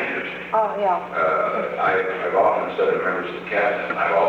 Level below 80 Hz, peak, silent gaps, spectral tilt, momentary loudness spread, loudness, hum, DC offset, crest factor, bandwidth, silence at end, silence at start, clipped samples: -60 dBFS; -6 dBFS; none; -6 dB/octave; 5 LU; -21 LUFS; none; under 0.1%; 14 dB; 8 kHz; 0 s; 0 s; under 0.1%